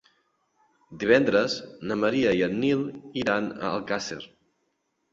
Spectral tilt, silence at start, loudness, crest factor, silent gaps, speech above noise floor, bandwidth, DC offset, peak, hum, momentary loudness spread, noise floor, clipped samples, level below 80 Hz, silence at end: -5 dB/octave; 0.9 s; -25 LUFS; 22 dB; none; 50 dB; 7.8 kHz; under 0.1%; -4 dBFS; none; 12 LU; -75 dBFS; under 0.1%; -62 dBFS; 0.85 s